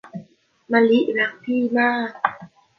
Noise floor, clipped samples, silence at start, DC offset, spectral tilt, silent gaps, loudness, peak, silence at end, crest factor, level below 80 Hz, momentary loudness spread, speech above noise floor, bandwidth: -50 dBFS; under 0.1%; 0.05 s; under 0.1%; -7 dB/octave; none; -20 LUFS; -2 dBFS; 0.3 s; 20 dB; -70 dBFS; 9 LU; 31 dB; 5.8 kHz